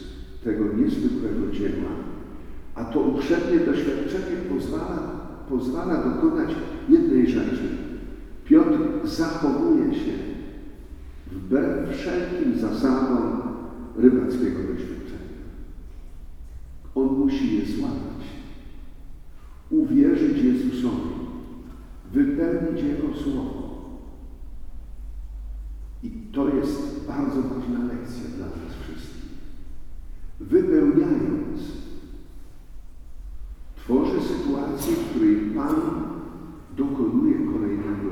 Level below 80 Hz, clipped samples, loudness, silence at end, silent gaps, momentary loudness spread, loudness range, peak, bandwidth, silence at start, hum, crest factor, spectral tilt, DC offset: -40 dBFS; under 0.1%; -24 LUFS; 0 s; none; 23 LU; 7 LU; -2 dBFS; 15.5 kHz; 0 s; none; 22 dB; -7.5 dB/octave; under 0.1%